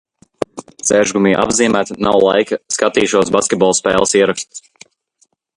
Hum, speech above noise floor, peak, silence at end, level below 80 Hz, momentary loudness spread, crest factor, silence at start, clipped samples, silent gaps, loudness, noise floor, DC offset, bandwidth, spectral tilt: none; 33 dB; 0 dBFS; 0.95 s; -48 dBFS; 13 LU; 16 dB; 0.4 s; under 0.1%; none; -14 LUFS; -46 dBFS; under 0.1%; 11.5 kHz; -3.5 dB/octave